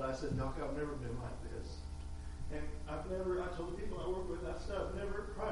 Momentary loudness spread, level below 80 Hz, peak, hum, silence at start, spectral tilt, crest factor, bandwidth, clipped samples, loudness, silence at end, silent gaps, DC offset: 9 LU; -46 dBFS; -26 dBFS; 60 Hz at -55 dBFS; 0 s; -6.5 dB/octave; 14 dB; 11.5 kHz; under 0.1%; -42 LUFS; 0 s; none; under 0.1%